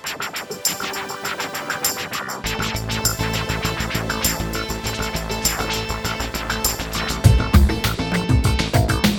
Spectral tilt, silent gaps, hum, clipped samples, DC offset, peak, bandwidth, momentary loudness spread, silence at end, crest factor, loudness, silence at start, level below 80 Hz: -4 dB/octave; none; none; under 0.1%; under 0.1%; 0 dBFS; over 20 kHz; 8 LU; 0 s; 20 dB; -21 LUFS; 0 s; -28 dBFS